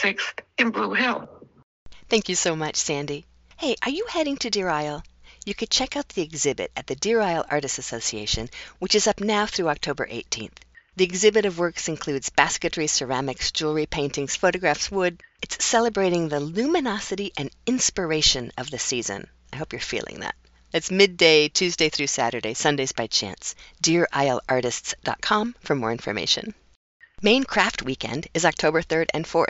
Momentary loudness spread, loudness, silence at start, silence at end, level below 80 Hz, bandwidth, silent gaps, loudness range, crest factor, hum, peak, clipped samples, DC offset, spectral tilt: 11 LU; -23 LUFS; 0 s; 0 s; -50 dBFS; 8.2 kHz; 1.63-1.86 s, 26.76-27.00 s; 4 LU; 24 dB; none; 0 dBFS; under 0.1%; under 0.1%; -2.5 dB/octave